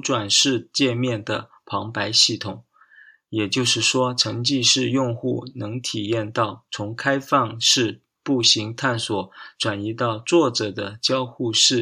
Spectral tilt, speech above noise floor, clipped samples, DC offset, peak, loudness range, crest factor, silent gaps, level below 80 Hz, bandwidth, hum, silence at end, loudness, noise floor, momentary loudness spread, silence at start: -3 dB/octave; 30 dB; under 0.1%; under 0.1%; -2 dBFS; 2 LU; 20 dB; none; -66 dBFS; 15.5 kHz; none; 0 s; -21 LUFS; -51 dBFS; 13 LU; 0.05 s